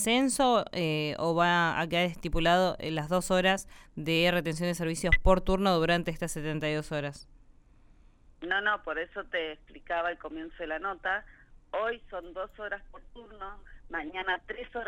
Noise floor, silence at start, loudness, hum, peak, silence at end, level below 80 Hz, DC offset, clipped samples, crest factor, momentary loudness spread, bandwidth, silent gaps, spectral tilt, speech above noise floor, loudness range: -58 dBFS; 0 s; -29 LUFS; none; -8 dBFS; 0 s; -42 dBFS; under 0.1%; under 0.1%; 22 dB; 15 LU; 16 kHz; none; -4.5 dB/octave; 28 dB; 9 LU